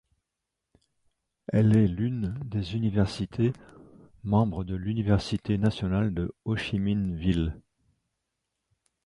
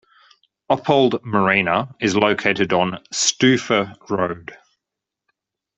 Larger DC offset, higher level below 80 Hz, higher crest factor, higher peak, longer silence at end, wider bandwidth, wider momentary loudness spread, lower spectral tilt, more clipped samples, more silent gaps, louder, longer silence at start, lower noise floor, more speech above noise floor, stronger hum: neither; first, -44 dBFS vs -58 dBFS; about the same, 18 dB vs 18 dB; second, -10 dBFS vs -2 dBFS; first, 1.45 s vs 1.2 s; first, 11 kHz vs 8.2 kHz; about the same, 9 LU vs 7 LU; first, -8 dB/octave vs -3.5 dB/octave; neither; neither; second, -28 LUFS vs -19 LUFS; first, 1.5 s vs 0.7 s; about the same, -85 dBFS vs -84 dBFS; second, 59 dB vs 65 dB; neither